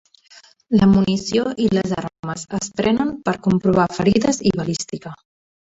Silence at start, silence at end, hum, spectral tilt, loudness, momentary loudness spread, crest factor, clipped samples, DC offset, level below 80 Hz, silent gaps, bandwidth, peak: 0.7 s; 0.65 s; none; -6 dB/octave; -19 LUFS; 12 LU; 16 dB; under 0.1%; under 0.1%; -46 dBFS; 2.19-2.23 s; 8 kHz; -2 dBFS